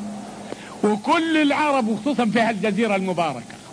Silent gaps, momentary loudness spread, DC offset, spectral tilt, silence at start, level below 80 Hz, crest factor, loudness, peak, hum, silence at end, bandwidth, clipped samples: none; 16 LU; under 0.1%; -5.5 dB/octave; 0 s; -62 dBFS; 14 dB; -21 LUFS; -6 dBFS; none; 0 s; 11 kHz; under 0.1%